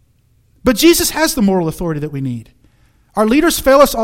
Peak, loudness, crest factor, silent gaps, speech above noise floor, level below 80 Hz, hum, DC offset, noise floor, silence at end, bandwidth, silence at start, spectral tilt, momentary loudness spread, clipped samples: 0 dBFS; -14 LUFS; 14 dB; none; 42 dB; -36 dBFS; none; under 0.1%; -55 dBFS; 0 s; 17 kHz; 0.65 s; -4 dB/octave; 13 LU; 0.2%